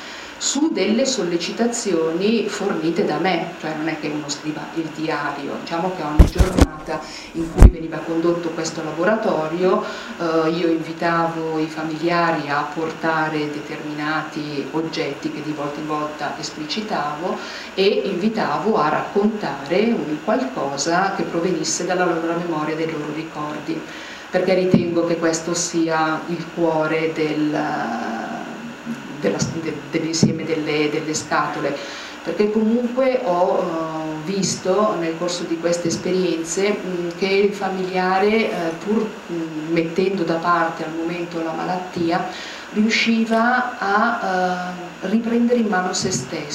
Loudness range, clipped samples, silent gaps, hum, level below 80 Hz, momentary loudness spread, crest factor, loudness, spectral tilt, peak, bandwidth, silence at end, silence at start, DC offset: 4 LU; under 0.1%; none; none; -30 dBFS; 9 LU; 20 dB; -21 LUFS; -5 dB/octave; 0 dBFS; 15.5 kHz; 0 s; 0 s; under 0.1%